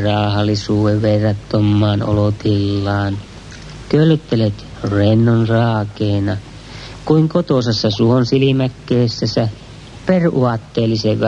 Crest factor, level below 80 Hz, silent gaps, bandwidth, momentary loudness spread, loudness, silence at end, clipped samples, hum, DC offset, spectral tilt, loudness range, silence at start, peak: 14 dB; -42 dBFS; none; 8 kHz; 13 LU; -16 LUFS; 0 s; under 0.1%; none; under 0.1%; -7.5 dB/octave; 1 LU; 0 s; -2 dBFS